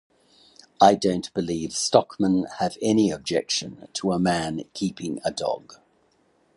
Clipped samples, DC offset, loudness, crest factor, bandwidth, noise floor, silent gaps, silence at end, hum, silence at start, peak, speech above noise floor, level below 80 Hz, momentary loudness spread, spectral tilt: under 0.1%; under 0.1%; -24 LUFS; 22 dB; 11.5 kHz; -64 dBFS; none; 0.8 s; none; 0.8 s; -2 dBFS; 41 dB; -56 dBFS; 11 LU; -4.5 dB/octave